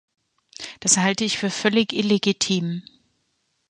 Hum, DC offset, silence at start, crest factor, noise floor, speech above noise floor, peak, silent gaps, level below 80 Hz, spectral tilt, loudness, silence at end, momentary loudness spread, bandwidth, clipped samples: none; under 0.1%; 0.6 s; 22 dB; -71 dBFS; 50 dB; -2 dBFS; none; -64 dBFS; -3 dB/octave; -21 LUFS; 0.9 s; 14 LU; 11 kHz; under 0.1%